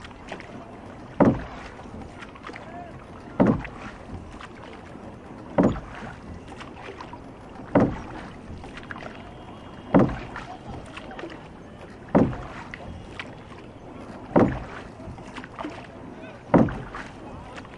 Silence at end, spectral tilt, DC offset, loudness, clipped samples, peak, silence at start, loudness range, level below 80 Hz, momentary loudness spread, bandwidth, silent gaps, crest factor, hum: 0 s; -8 dB/octave; under 0.1%; -27 LUFS; under 0.1%; -4 dBFS; 0 s; 4 LU; -46 dBFS; 20 LU; 10.5 kHz; none; 24 dB; none